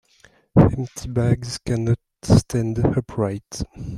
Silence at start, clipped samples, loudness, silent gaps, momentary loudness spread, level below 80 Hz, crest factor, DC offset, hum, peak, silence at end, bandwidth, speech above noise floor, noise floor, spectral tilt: 0.55 s; under 0.1%; -21 LUFS; none; 11 LU; -38 dBFS; 20 dB; under 0.1%; none; -2 dBFS; 0 s; 13 kHz; 34 dB; -55 dBFS; -7 dB/octave